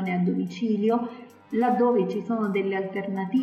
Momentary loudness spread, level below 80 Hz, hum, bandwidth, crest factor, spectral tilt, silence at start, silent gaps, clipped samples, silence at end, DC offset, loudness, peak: 8 LU; -78 dBFS; none; 8 kHz; 12 dB; -8.5 dB/octave; 0 s; none; under 0.1%; 0 s; under 0.1%; -25 LUFS; -14 dBFS